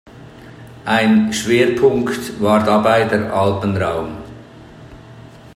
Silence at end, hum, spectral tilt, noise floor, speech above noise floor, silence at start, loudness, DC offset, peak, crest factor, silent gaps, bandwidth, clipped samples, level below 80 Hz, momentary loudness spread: 0.05 s; none; -5.5 dB/octave; -39 dBFS; 24 dB; 0.05 s; -16 LUFS; under 0.1%; 0 dBFS; 16 dB; none; 15.5 kHz; under 0.1%; -48 dBFS; 13 LU